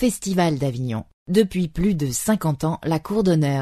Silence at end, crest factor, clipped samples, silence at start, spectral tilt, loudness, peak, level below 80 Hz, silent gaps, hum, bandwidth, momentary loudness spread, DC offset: 0 s; 16 dB; under 0.1%; 0 s; -6 dB/octave; -22 LUFS; -4 dBFS; -42 dBFS; 1.13-1.26 s; none; 13.5 kHz; 5 LU; under 0.1%